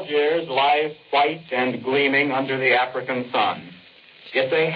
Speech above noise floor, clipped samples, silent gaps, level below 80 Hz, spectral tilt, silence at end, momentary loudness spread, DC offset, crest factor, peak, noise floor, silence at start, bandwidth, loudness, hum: 27 dB; under 0.1%; none; -70 dBFS; -7.5 dB/octave; 0 s; 6 LU; under 0.1%; 16 dB; -6 dBFS; -48 dBFS; 0 s; 5.2 kHz; -21 LUFS; none